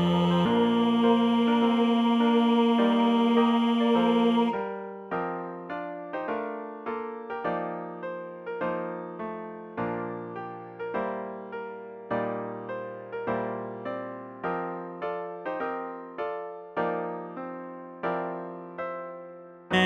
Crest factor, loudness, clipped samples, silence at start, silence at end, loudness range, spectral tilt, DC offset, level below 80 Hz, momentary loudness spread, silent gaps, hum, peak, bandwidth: 18 dB; -28 LUFS; under 0.1%; 0 s; 0 s; 12 LU; -7 dB/octave; under 0.1%; -68 dBFS; 15 LU; none; none; -10 dBFS; 7.6 kHz